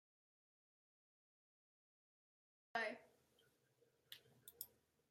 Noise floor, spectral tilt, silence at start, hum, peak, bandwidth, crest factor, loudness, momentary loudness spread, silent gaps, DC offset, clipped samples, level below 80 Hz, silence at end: -80 dBFS; -2 dB/octave; 2.75 s; none; -30 dBFS; 16 kHz; 28 dB; -50 LUFS; 16 LU; none; under 0.1%; under 0.1%; under -90 dBFS; 0.45 s